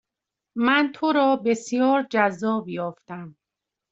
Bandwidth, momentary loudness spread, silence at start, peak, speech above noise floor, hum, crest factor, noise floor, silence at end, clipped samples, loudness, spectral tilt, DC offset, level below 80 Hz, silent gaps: 8 kHz; 16 LU; 0.55 s; -4 dBFS; 64 dB; none; 18 dB; -86 dBFS; 0.6 s; under 0.1%; -22 LUFS; -5 dB/octave; under 0.1%; -70 dBFS; none